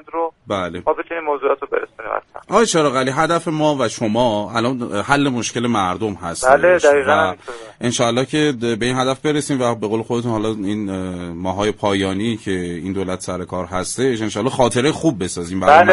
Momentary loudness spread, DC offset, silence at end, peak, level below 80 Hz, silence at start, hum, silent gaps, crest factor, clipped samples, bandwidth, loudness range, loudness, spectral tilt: 10 LU; under 0.1%; 0 s; 0 dBFS; -48 dBFS; 0.15 s; none; none; 18 dB; under 0.1%; 11.5 kHz; 5 LU; -18 LUFS; -4.5 dB/octave